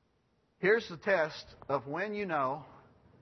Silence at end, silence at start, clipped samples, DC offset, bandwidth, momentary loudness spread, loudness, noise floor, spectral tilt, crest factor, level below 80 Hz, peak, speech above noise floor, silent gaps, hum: 0.45 s; 0.6 s; under 0.1%; under 0.1%; 6.2 kHz; 7 LU; -33 LUFS; -73 dBFS; -3.5 dB/octave; 20 dB; -70 dBFS; -14 dBFS; 41 dB; none; none